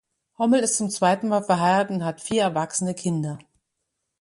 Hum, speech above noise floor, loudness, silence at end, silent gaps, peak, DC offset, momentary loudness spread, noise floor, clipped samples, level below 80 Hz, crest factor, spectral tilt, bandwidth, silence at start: none; 57 dB; -23 LUFS; 0.85 s; none; -6 dBFS; under 0.1%; 8 LU; -79 dBFS; under 0.1%; -66 dBFS; 18 dB; -4.5 dB/octave; 11.5 kHz; 0.4 s